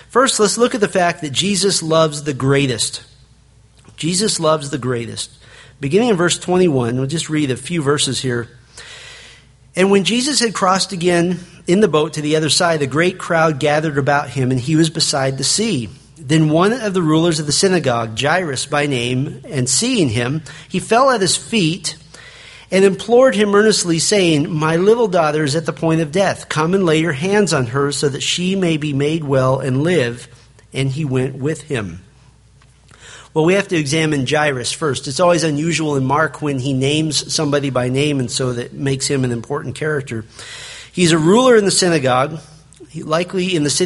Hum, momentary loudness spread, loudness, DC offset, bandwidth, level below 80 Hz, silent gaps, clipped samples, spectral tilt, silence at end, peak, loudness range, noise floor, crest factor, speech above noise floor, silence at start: none; 10 LU; -16 LUFS; under 0.1%; 11.5 kHz; -50 dBFS; none; under 0.1%; -4.5 dB/octave; 0 s; 0 dBFS; 5 LU; -49 dBFS; 16 dB; 33 dB; 0.1 s